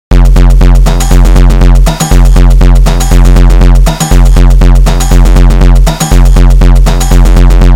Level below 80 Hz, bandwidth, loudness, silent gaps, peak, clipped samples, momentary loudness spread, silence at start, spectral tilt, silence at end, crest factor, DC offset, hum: -2 dBFS; 14 kHz; -6 LUFS; none; 0 dBFS; 40%; 2 LU; 0.1 s; -6 dB/octave; 0 s; 2 dB; under 0.1%; none